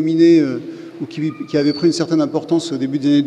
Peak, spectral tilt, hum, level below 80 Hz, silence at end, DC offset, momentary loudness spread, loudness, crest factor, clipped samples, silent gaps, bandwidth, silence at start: -2 dBFS; -6.5 dB/octave; none; -66 dBFS; 0 s; under 0.1%; 16 LU; -17 LUFS; 14 dB; under 0.1%; none; 9.6 kHz; 0 s